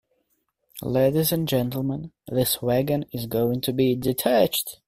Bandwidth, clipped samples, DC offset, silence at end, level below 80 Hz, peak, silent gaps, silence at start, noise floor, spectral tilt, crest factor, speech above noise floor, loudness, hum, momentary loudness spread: 16 kHz; under 0.1%; under 0.1%; 0.15 s; -54 dBFS; -6 dBFS; none; 0.75 s; -73 dBFS; -5.5 dB/octave; 18 dB; 49 dB; -23 LUFS; none; 9 LU